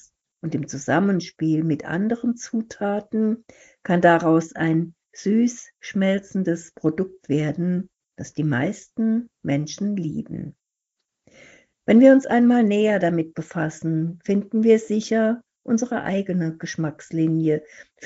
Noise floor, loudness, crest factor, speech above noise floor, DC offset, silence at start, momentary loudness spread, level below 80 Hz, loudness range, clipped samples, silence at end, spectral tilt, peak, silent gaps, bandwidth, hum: -82 dBFS; -22 LUFS; 18 dB; 60 dB; under 0.1%; 0.45 s; 12 LU; -64 dBFS; 6 LU; under 0.1%; 0 s; -7 dB/octave; -4 dBFS; none; 8 kHz; none